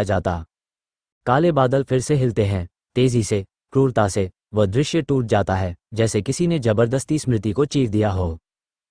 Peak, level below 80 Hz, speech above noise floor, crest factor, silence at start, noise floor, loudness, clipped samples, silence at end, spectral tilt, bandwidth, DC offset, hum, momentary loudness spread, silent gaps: -2 dBFS; -44 dBFS; over 71 dB; 18 dB; 0 s; under -90 dBFS; -21 LUFS; under 0.1%; 0.55 s; -6.5 dB/octave; 10.5 kHz; under 0.1%; none; 7 LU; 1.12-1.21 s